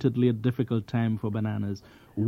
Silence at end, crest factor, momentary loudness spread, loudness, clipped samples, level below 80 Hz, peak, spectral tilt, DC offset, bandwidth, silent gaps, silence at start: 0 s; 16 dB; 11 LU; -28 LUFS; under 0.1%; -60 dBFS; -12 dBFS; -9 dB/octave; under 0.1%; 6.2 kHz; none; 0 s